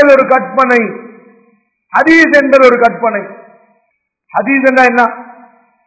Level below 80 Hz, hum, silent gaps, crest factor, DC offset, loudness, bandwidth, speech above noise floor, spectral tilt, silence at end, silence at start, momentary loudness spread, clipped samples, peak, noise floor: -52 dBFS; none; none; 10 dB; under 0.1%; -9 LUFS; 8 kHz; 55 dB; -5 dB/octave; 0.65 s; 0 s; 14 LU; 2%; 0 dBFS; -64 dBFS